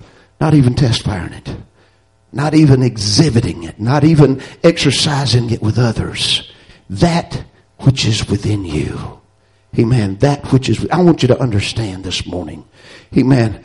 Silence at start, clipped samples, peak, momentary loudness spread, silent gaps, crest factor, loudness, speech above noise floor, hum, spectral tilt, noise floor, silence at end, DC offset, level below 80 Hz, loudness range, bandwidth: 0.4 s; under 0.1%; 0 dBFS; 14 LU; none; 14 dB; -14 LUFS; 40 dB; none; -6 dB/octave; -53 dBFS; 0.05 s; under 0.1%; -36 dBFS; 4 LU; 11.5 kHz